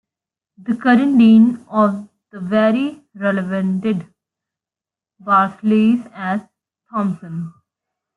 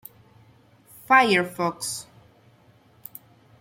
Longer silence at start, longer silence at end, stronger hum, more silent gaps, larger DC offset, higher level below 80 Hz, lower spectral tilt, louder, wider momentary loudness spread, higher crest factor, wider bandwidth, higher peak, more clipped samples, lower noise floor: second, 0.6 s vs 1.1 s; second, 0.65 s vs 1.6 s; neither; neither; neither; first, -64 dBFS vs -70 dBFS; first, -8.5 dB/octave vs -3.5 dB/octave; first, -17 LUFS vs -22 LUFS; second, 18 LU vs 26 LU; second, 14 dB vs 22 dB; second, 4.7 kHz vs 16.5 kHz; about the same, -2 dBFS vs -4 dBFS; neither; first, -89 dBFS vs -57 dBFS